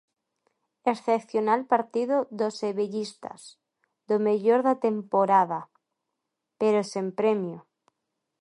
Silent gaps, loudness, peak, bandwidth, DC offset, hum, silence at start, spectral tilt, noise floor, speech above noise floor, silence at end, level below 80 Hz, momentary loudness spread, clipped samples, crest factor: none; -26 LUFS; -8 dBFS; 11 kHz; under 0.1%; none; 0.85 s; -6 dB/octave; -83 dBFS; 58 dB; 0.8 s; -80 dBFS; 13 LU; under 0.1%; 18 dB